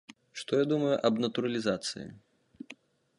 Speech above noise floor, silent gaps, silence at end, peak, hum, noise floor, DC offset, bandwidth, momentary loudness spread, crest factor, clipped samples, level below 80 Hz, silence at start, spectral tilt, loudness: 25 dB; none; 0.45 s; -12 dBFS; none; -55 dBFS; under 0.1%; 11.5 kHz; 21 LU; 20 dB; under 0.1%; -72 dBFS; 0.35 s; -5 dB/octave; -30 LUFS